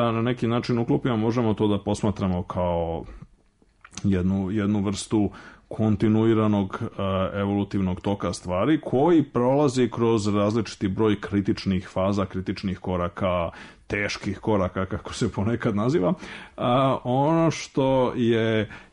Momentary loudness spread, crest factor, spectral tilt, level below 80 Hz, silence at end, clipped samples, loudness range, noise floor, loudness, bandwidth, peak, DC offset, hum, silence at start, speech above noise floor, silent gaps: 8 LU; 12 dB; -7 dB/octave; -50 dBFS; 0.1 s; under 0.1%; 4 LU; -61 dBFS; -24 LUFS; 10.5 kHz; -12 dBFS; under 0.1%; none; 0 s; 37 dB; none